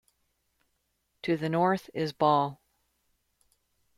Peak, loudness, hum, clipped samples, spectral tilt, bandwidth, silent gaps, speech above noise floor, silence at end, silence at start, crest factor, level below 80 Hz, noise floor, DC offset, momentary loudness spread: -12 dBFS; -28 LUFS; none; under 0.1%; -7 dB/octave; 15 kHz; none; 50 dB; 1.45 s; 1.25 s; 20 dB; -72 dBFS; -77 dBFS; under 0.1%; 10 LU